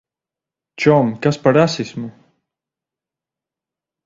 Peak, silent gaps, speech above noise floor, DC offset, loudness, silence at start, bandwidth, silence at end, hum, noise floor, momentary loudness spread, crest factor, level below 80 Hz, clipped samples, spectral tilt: 0 dBFS; none; 72 dB; under 0.1%; -16 LUFS; 0.8 s; 7.8 kHz; 1.95 s; none; -87 dBFS; 15 LU; 20 dB; -58 dBFS; under 0.1%; -6.5 dB/octave